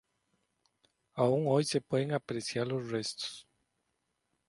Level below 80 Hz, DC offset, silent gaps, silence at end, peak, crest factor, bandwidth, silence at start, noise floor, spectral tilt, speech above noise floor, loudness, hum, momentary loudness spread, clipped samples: -74 dBFS; under 0.1%; none; 1.05 s; -14 dBFS; 20 dB; 11.5 kHz; 1.15 s; -81 dBFS; -5.5 dB/octave; 50 dB; -33 LUFS; none; 11 LU; under 0.1%